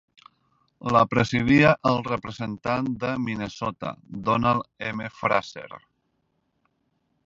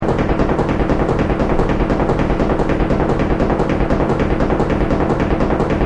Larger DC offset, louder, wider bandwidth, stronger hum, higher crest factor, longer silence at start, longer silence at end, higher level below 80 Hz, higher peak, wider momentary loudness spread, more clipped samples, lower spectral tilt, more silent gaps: neither; second, -24 LUFS vs -17 LUFS; second, 7.8 kHz vs 9.6 kHz; neither; first, 22 dB vs 14 dB; first, 0.85 s vs 0 s; first, 1.45 s vs 0 s; second, -52 dBFS vs -22 dBFS; second, -4 dBFS vs 0 dBFS; first, 16 LU vs 0 LU; neither; second, -6.5 dB/octave vs -8 dB/octave; neither